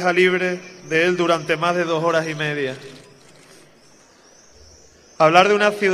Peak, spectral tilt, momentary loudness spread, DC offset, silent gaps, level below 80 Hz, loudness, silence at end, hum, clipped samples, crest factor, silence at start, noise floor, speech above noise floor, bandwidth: 0 dBFS; -4.5 dB/octave; 12 LU; under 0.1%; none; -64 dBFS; -18 LUFS; 0 s; none; under 0.1%; 20 dB; 0 s; -51 dBFS; 33 dB; 13 kHz